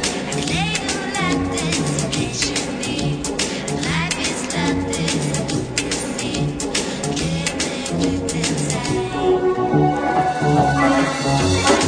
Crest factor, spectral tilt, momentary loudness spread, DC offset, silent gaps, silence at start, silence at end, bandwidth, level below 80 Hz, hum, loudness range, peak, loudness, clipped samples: 18 dB; -4 dB/octave; 6 LU; under 0.1%; none; 0 s; 0 s; 10 kHz; -40 dBFS; none; 3 LU; -2 dBFS; -20 LUFS; under 0.1%